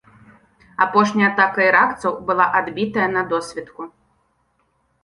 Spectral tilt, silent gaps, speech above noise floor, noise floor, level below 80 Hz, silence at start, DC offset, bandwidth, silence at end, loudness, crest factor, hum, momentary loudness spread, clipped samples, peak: -5.5 dB/octave; none; 47 dB; -65 dBFS; -58 dBFS; 0.8 s; under 0.1%; 11.5 kHz; 1.15 s; -18 LUFS; 20 dB; none; 19 LU; under 0.1%; 0 dBFS